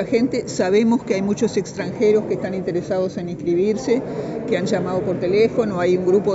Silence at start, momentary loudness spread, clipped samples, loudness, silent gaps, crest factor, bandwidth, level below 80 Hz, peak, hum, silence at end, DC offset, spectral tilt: 0 s; 7 LU; under 0.1%; -20 LUFS; none; 14 dB; 8 kHz; -52 dBFS; -6 dBFS; none; 0 s; under 0.1%; -6 dB/octave